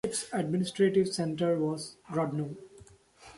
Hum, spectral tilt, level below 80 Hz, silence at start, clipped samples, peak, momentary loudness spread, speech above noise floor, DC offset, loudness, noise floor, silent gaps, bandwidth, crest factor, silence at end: none; -5.5 dB/octave; -66 dBFS; 0.05 s; under 0.1%; -14 dBFS; 11 LU; 26 dB; under 0.1%; -30 LUFS; -56 dBFS; none; 11.5 kHz; 16 dB; 0 s